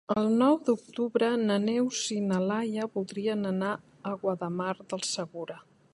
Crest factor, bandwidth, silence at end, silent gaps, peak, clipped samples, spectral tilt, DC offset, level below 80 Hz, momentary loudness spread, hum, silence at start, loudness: 18 dB; 11.5 kHz; 0.35 s; none; -12 dBFS; under 0.1%; -5 dB/octave; under 0.1%; -72 dBFS; 11 LU; none; 0.1 s; -29 LUFS